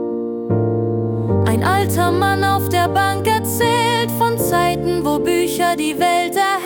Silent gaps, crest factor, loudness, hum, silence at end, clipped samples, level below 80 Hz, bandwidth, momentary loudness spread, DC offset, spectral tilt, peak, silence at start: none; 14 dB; -17 LUFS; none; 0 s; under 0.1%; -46 dBFS; 19 kHz; 3 LU; under 0.1%; -5 dB/octave; -4 dBFS; 0 s